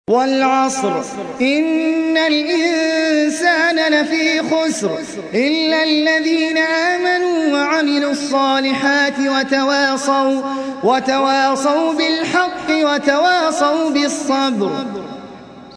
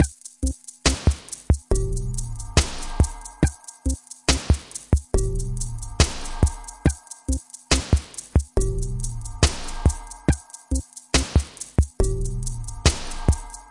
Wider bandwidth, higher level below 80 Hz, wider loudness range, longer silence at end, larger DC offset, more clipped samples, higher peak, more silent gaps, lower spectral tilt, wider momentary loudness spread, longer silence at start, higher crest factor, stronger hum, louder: about the same, 11 kHz vs 11.5 kHz; second, -60 dBFS vs -26 dBFS; about the same, 1 LU vs 1 LU; about the same, 0 s vs 0.05 s; neither; neither; first, 0 dBFS vs -4 dBFS; neither; second, -3 dB/octave vs -4.5 dB/octave; about the same, 6 LU vs 8 LU; about the same, 0.1 s vs 0 s; about the same, 16 dB vs 18 dB; neither; first, -16 LUFS vs -25 LUFS